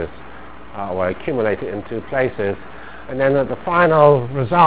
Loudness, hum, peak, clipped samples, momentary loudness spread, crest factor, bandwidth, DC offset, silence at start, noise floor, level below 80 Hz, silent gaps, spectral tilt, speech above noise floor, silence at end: -18 LUFS; none; 0 dBFS; under 0.1%; 23 LU; 18 dB; 4 kHz; 2%; 0 s; -38 dBFS; -44 dBFS; none; -11 dB/octave; 21 dB; 0 s